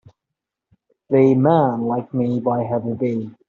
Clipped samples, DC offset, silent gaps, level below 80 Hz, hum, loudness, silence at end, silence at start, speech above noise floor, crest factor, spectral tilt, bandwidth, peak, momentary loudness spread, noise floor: under 0.1%; under 0.1%; none; -62 dBFS; none; -19 LUFS; 0.2 s; 1.1 s; 65 dB; 18 dB; -9 dB/octave; 6.6 kHz; -2 dBFS; 9 LU; -83 dBFS